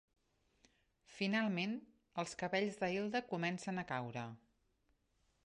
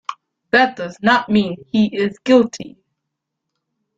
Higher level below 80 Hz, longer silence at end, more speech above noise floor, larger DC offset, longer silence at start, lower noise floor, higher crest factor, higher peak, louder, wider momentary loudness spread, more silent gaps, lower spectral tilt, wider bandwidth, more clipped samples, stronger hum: second, -78 dBFS vs -58 dBFS; second, 1.1 s vs 1.3 s; second, 39 dB vs 62 dB; neither; first, 1.1 s vs 0.1 s; about the same, -79 dBFS vs -78 dBFS; about the same, 20 dB vs 18 dB; second, -24 dBFS vs -2 dBFS; second, -40 LUFS vs -17 LUFS; about the same, 11 LU vs 13 LU; neither; about the same, -5.5 dB/octave vs -5.5 dB/octave; first, 11 kHz vs 7.8 kHz; neither; neither